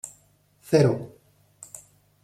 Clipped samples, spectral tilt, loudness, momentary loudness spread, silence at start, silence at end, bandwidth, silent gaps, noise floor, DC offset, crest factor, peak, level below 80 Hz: under 0.1%; -6.5 dB/octave; -23 LUFS; 24 LU; 0.05 s; 0.45 s; 15 kHz; none; -61 dBFS; under 0.1%; 20 dB; -6 dBFS; -64 dBFS